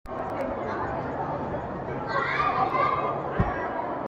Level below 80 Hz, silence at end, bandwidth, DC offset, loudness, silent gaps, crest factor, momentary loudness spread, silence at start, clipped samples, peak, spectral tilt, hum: -46 dBFS; 0 s; 9 kHz; under 0.1%; -28 LUFS; none; 18 dB; 8 LU; 0.05 s; under 0.1%; -10 dBFS; -7.5 dB/octave; none